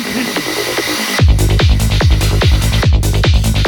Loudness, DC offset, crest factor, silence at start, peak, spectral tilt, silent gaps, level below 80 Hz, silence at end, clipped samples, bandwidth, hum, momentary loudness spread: -13 LUFS; under 0.1%; 10 dB; 0 s; 0 dBFS; -4.5 dB/octave; none; -14 dBFS; 0 s; under 0.1%; 19 kHz; none; 5 LU